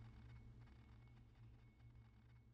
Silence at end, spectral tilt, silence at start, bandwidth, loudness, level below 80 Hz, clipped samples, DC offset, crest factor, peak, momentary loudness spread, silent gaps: 0 s; -7 dB/octave; 0 s; 7.2 kHz; -65 LUFS; -68 dBFS; under 0.1%; under 0.1%; 12 dB; -52 dBFS; 5 LU; none